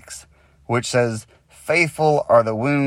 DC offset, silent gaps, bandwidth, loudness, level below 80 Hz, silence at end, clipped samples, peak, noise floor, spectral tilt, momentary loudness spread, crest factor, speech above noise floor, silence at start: under 0.1%; none; 15.5 kHz; -19 LUFS; -56 dBFS; 0 s; under 0.1%; -2 dBFS; -48 dBFS; -5.5 dB/octave; 19 LU; 18 dB; 30 dB; 0.1 s